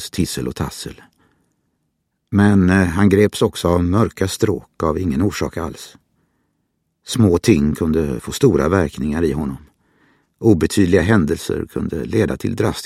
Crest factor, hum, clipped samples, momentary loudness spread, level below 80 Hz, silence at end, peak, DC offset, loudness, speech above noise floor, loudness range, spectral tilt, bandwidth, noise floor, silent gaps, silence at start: 18 dB; none; under 0.1%; 11 LU; -36 dBFS; 0 s; 0 dBFS; under 0.1%; -17 LUFS; 54 dB; 4 LU; -6.5 dB/octave; 15.5 kHz; -71 dBFS; none; 0 s